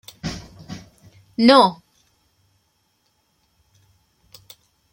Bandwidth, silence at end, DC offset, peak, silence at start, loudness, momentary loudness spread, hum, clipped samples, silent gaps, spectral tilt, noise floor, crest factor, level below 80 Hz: 16.5 kHz; 3.2 s; under 0.1%; 0 dBFS; 0.25 s; -17 LUFS; 26 LU; none; under 0.1%; none; -5 dB/octave; -67 dBFS; 22 dB; -54 dBFS